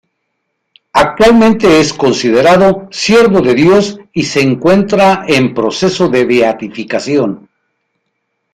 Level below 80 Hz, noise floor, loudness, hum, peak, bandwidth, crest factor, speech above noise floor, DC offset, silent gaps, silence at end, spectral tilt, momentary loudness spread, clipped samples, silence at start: -40 dBFS; -68 dBFS; -10 LUFS; none; 0 dBFS; 14.5 kHz; 10 dB; 59 dB; under 0.1%; none; 1.2 s; -5 dB/octave; 9 LU; under 0.1%; 0.95 s